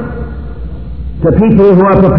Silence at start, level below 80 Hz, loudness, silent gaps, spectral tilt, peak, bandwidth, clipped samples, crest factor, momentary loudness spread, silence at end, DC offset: 0 s; -22 dBFS; -7 LUFS; none; -12 dB/octave; 0 dBFS; 5.4 kHz; 2%; 10 dB; 19 LU; 0 s; 3%